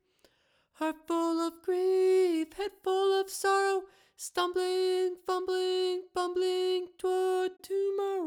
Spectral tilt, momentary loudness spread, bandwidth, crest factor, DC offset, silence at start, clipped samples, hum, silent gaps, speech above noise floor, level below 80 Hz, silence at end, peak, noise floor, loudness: -2 dB/octave; 8 LU; 17 kHz; 14 dB; under 0.1%; 0.8 s; under 0.1%; none; none; 39 dB; -72 dBFS; 0 s; -16 dBFS; -70 dBFS; -30 LUFS